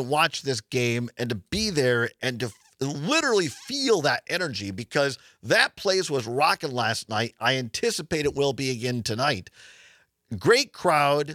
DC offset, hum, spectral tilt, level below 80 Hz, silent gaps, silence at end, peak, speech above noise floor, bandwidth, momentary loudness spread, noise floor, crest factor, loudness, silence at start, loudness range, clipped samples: under 0.1%; none; -4 dB/octave; -58 dBFS; none; 0 s; -2 dBFS; 32 dB; 16 kHz; 9 LU; -57 dBFS; 22 dB; -25 LUFS; 0 s; 2 LU; under 0.1%